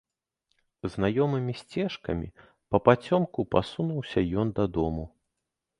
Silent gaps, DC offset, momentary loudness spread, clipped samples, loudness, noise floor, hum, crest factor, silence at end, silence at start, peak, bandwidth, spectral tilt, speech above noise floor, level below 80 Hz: none; under 0.1%; 13 LU; under 0.1%; -28 LUFS; -84 dBFS; none; 26 dB; 0.7 s; 0.85 s; -2 dBFS; 11 kHz; -8 dB/octave; 57 dB; -48 dBFS